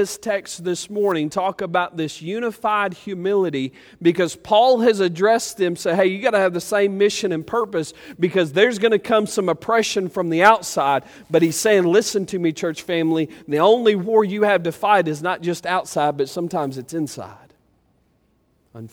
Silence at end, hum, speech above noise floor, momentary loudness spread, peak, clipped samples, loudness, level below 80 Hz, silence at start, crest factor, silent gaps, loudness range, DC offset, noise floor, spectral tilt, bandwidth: 0.05 s; none; 43 dB; 10 LU; 0 dBFS; under 0.1%; -20 LUFS; -62 dBFS; 0 s; 20 dB; none; 4 LU; under 0.1%; -63 dBFS; -4.5 dB/octave; over 20 kHz